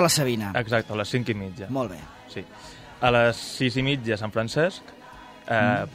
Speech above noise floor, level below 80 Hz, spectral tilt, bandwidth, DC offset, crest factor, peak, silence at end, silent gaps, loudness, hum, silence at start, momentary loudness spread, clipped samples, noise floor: 21 dB; -52 dBFS; -4.5 dB/octave; 16 kHz; under 0.1%; 20 dB; -4 dBFS; 0 s; none; -25 LUFS; none; 0 s; 21 LU; under 0.1%; -45 dBFS